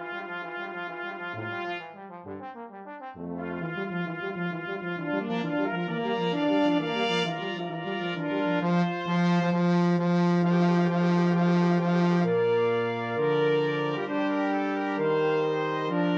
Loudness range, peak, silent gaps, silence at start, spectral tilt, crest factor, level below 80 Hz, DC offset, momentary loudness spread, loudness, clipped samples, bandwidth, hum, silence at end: 11 LU; -12 dBFS; none; 0 s; -7.5 dB/octave; 14 dB; -72 dBFS; under 0.1%; 11 LU; -27 LUFS; under 0.1%; 7 kHz; none; 0 s